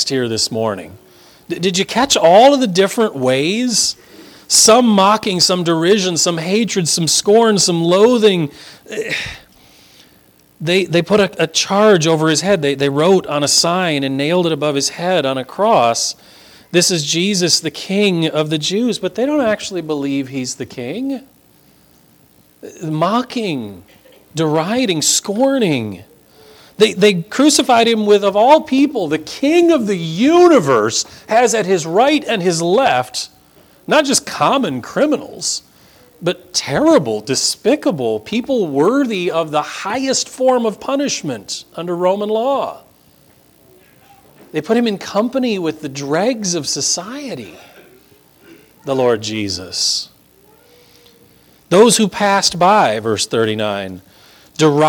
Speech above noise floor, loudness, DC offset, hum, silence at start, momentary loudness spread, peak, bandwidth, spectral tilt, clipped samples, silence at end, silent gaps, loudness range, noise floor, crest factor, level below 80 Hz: 36 dB; -15 LUFS; under 0.1%; none; 0 s; 12 LU; 0 dBFS; 19 kHz; -3.5 dB/octave; under 0.1%; 0 s; none; 8 LU; -50 dBFS; 16 dB; -56 dBFS